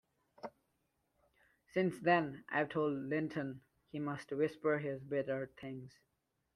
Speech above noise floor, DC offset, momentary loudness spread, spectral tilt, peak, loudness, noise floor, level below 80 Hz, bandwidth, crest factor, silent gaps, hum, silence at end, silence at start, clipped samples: 44 dB; under 0.1%; 19 LU; -7.5 dB/octave; -16 dBFS; -37 LUFS; -81 dBFS; -78 dBFS; 12.5 kHz; 22 dB; none; none; 0.65 s; 0.45 s; under 0.1%